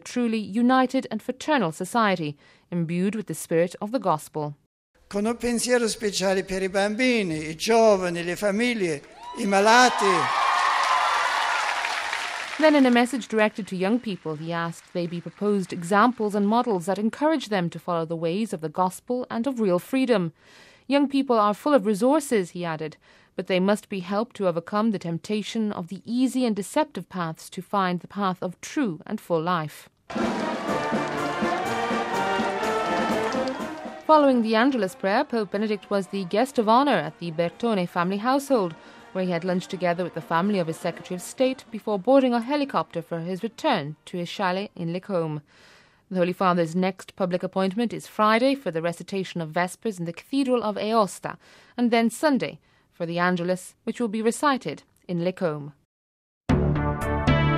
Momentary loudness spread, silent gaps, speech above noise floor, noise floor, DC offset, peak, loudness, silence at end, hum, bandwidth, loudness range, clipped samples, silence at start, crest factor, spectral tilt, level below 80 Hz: 11 LU; 4.66-4.94 s, 55.85-56.41 s; over 66 dB; under -90 dBFS; under 0.1%; -2 dBFS; -24 LUFS; 0 s; none; 15.5 kHz; 6 LU; under 0.1%; 0.05 s; 22 dB; -5 dB/octave; -48 dBFS